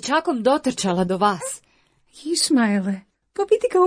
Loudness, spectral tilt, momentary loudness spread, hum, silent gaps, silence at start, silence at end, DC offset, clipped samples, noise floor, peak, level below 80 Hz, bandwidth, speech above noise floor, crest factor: -21 LUFS; -4 dB/octave; 14 LU; none; none; 0 s; 0 s; under 0.1%; under 0.1%; -61 dBFS; -6 dBFS; -58 dBFS; 10.5 kHz; 41 dB; 16 dB